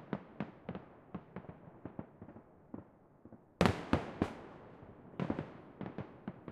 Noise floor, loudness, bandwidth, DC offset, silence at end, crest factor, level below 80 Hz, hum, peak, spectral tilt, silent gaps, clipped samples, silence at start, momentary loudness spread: -61 dBFS; -41 LUFS; 14 kHz; under 0.1%; 0 s; 34 dB; -58 dBFS; none; -8 dBFS; -6.5 dB/octave; none; under 0.1%; 0 s; 22 LU